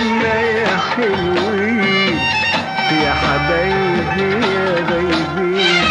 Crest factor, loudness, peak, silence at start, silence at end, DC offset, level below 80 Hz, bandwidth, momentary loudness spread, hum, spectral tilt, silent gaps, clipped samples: 12 dB; -15 LUFS; -4 dBFS; 0 s; 0 s; under 0.1%; -38 dBFS; 11 kHz; 3 LU; none; -5 dB/octave; none; under 0.1%